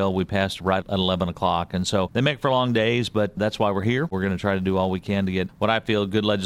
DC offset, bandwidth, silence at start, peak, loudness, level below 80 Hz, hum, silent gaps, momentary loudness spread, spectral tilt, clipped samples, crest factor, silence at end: under 0.1%; 14 kHz; 0 s; -6 dBFS; -23 LUFS; -50 dBFS; none; none; 4 LU; -6 dB/octave; under 0.1%; 16 dB; 0 s